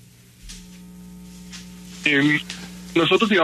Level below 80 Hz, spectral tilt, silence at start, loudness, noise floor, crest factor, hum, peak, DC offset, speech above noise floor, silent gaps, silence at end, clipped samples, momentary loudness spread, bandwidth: -50 dBFS; -4.5 dB/octave; 0.45 s; -19 LUFS; -45 dBFS; 18 dB; 60 Hz at -40 dBFS; -6 dBFS; under 0.1%; 27 dB; none; 0 s; under 0.1%; 24 LU; 13.5 kHz